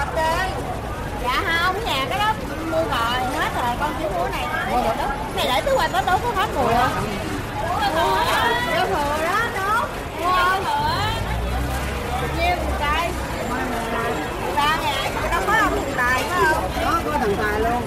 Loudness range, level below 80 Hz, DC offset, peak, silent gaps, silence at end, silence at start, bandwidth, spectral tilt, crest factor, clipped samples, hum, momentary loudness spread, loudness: 2 LU; -32 dBFS; under 0.1%; -6 dBFS; none; 0 s; 0 s; 16 kHz; -4.5 dB/octave; 16 dB; under 0.1%; none; 6 LU; -21 LUFS